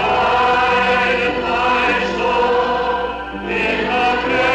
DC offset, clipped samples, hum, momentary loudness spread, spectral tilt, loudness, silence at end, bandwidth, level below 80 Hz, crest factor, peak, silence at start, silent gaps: under 0.1%; under 0.1%; none; 6 LU; -4.5 dB/octave; -16 LUFS; 0 s; 9.4 kHz; -38 dBFS; 10 dB; -8 dBFS; 0 s; none